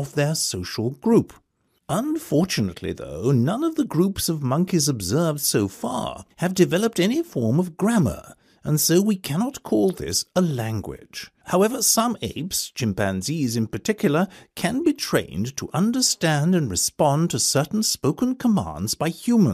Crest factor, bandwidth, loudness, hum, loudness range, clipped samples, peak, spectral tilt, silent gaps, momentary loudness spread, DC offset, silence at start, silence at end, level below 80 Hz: 18 dB; 15.5 kHz; -22 LUFS; none; 3 LU; under 0.1%; -4 dBFS; -4.5 dB/octave; none; 8 LU; under 0.1%; 0 s; 0 s; -52 dBFS